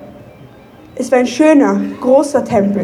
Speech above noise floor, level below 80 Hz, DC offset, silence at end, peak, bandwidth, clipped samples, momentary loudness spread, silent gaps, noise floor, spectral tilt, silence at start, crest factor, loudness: 27 dB; -52 dBFS; under 0.1%; 0 s; 0 dBFS; 12.5 kHz; under 0.1%; 9 LU; none; -39 dBFS; -6 dB/octave; 0 s; 12 dB; -12 LUFS